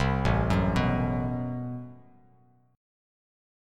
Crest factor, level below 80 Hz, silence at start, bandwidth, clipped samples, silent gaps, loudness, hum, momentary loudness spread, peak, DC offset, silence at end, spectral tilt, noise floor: 18 dB; -38 dBFS; 0 s; 11 kHz; under 0.1%; none; -28 LUFS; none; 13 LU; -12 dBFS; under 0.1%; 1.75 s; -7.5 dB/octave; -62 dBFS